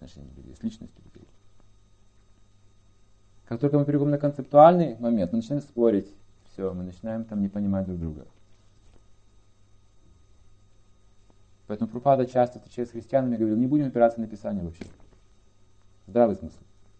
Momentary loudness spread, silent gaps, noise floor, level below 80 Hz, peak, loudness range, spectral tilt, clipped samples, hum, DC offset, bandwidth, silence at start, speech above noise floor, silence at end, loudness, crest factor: 17 LU; none; -59 dBFS; -54 dBFS; -4 dBFS; 15 LU; -9.5 dB/octave; under 0.1%; 50 Hz at -55 dBFS; under 0.1%; 8.6 kHz; 0 s; 35 dB; 0.5 s; -25 LUFS; 24 dB